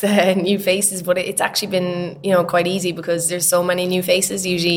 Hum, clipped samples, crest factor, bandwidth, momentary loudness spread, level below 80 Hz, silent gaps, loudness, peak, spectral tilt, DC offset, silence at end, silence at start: none; under 0.1%; 18 dB; 19 kHz; 5 LU; -58 dBFS; none; -18 LUFS; 0 dBFS; -3.5 dB/octave; under 0.1%; 0 s; 0 s